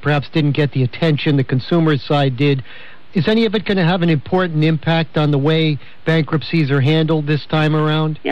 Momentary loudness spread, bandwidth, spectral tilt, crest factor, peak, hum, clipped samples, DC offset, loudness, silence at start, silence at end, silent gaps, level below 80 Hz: 3 LU; 6.2 kHz; -8.5 dB/octave; 10 dB; -6 dBFS; none; under 0.1%; 2%; -16 LUFS; 0.05 s; 0 s; none; -50 dBFS